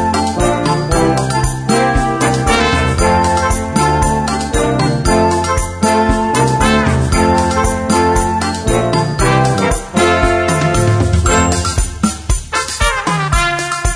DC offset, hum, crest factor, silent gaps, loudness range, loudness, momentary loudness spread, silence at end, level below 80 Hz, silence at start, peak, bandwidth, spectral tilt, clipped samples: under 0.1%; none; 12 dB; none; 1 LU; -13 LUFS; 4 LU; 0 s; -22 dBFS; 0 s; 0 dBFS; 11 kHz; -5 dB/octave; under 0.1%